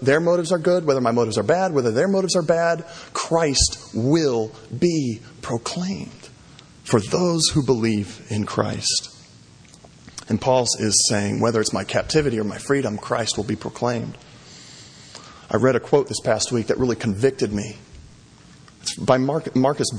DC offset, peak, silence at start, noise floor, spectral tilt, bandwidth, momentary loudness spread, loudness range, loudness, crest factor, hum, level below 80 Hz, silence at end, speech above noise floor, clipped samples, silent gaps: under 0.1%; -2 dBFS; 0 s; -48 dBFS; -4.5 dB/octave; 10.5 kHz; 15 LU; 4 LU; -21 LUFS; 20 dB; none; -44 dBFS; 0 s; 27 dB; under 0.1%; none